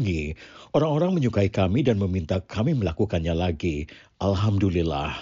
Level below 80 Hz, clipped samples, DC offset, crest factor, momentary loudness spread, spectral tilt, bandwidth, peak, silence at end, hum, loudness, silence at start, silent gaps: -40 dBFS; under 0.1%; under 0.1%; 14 dB; 7 LU; -7 dB/octave; 7.6 kHz; -10 dBFS; 0 s; none; -24 LUFS; 0 s; none